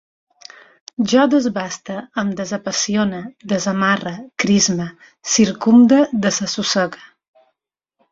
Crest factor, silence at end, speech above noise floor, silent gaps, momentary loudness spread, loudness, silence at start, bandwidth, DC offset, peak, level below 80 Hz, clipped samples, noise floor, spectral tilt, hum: 16 dB; 1.05 s; 61 dB; none; 13 LU; -17 LUFS; 1 s; 7.8 kHz; under 0.1%; -2 dBFS; -58 dBFS; under 0.1%; -78 dBFS; -4 dB/octave; none